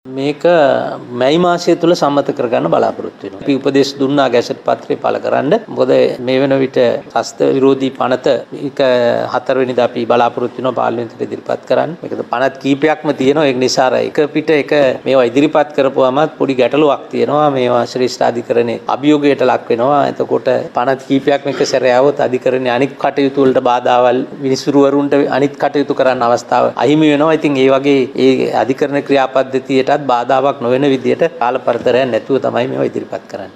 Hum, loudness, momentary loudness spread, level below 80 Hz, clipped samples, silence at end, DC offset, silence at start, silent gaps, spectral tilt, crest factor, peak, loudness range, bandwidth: none; -13 LUFS; 6 LU; -60 dBFS; under 0.1%; 0.05 s; under 0.1%; 0.05 s; none; -5.5 dB/octave; 12 dB; 0 dBFS; 3 LU; 11.5 kHz